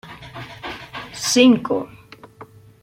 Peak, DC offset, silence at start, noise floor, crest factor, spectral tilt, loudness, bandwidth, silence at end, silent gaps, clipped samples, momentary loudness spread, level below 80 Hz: -2 dBFS; under 0.1%; 0.05 s; -44 dBFS; 20 dB; -3.5 dB/octave; -17 LUFS; 16.5 kHz; 0.4 s; none; under 0.1%; 22 LU; -56 dBFS